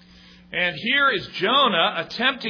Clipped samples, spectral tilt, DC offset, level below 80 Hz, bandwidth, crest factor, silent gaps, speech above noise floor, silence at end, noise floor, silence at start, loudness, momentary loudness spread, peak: under 0.1%; -4.5 dB/octave; under 0.1%; -60 dBFS; 5.4 kHz; 18 dB; none; 27 dB; 0 s; -49 dBFS; 0.5 s; -20 LUFS; 6 LU; -6 dBFS